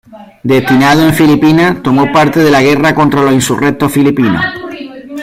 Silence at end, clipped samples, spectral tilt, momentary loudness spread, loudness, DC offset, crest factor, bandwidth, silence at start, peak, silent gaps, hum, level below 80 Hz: 0 s; under 0.1%; -5.5 dB/octave; 11 LU; -9 LUFS; under 0.1%; 8 dB; 16 kHz; 0.1 s; 0 dBFS; none; none; -40 dBFS